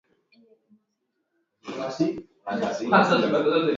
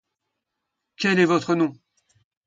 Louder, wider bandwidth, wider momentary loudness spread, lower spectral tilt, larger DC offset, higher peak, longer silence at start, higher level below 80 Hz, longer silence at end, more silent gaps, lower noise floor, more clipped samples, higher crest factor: about the same, -23 LUFS vs -21 LUFS; about the same, 7.6 kHz vs 7.8 kHz; first, 17 LU vs 7 LU; about the same, -6 dB/octave vs -5.5 dB/octave; neither; about the same, -4 dBFS vs -6 dBFS; first, 1.65 s vs 1 s; about the same, -68 dBFS vs -70 dBFS; second, 0 s vs 0.75 s; neither; second, -77 dBFS vs -81 dBFS; neither; about the same, 22 dB vs 18 dB